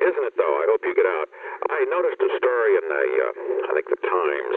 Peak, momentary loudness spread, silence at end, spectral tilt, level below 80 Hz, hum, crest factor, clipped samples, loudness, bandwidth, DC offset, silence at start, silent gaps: -6 dBFS; 6 LU; 0 s; -5.5 dB/octave; -80 dBFS; none; 16 dB; under 0.1%; -22 LUFS; 4 kHz; under 0.1%; 0 s; none